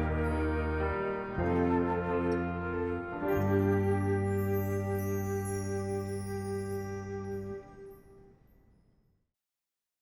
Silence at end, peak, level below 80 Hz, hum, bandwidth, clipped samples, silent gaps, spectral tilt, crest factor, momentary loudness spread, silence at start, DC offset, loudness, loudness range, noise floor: 1.75 s; -16 dBFS; -46 dBFS; none; 18 kHz; under 0.1%; none; -7.5 dB/octave; 16 dB; 10 LU; 0 s; under 0.1%; -32 LUFS; 10 LU; -90 dBFS